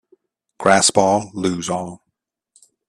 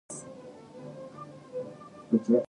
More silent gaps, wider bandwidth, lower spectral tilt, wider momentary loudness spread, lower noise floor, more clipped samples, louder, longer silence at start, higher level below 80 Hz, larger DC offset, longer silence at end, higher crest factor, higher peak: neither; first, 13 kHz vs 10.5 kHz; second, -3 dB/octave vs -7 dB/octave; second, 13 LU vs 18 LU; first, -77 dBFS vs -47 dBFS; neither; first, -17 LUFS vs -34 LUFS; first, 0.6 s vs 0.1 s; first, -56 dBFS vs -76 dBFS; neither; first, 0.95 s vs 0 s; about the same, 20 dB vs 20 dB; first, 0 dBFS vs -12 dBFS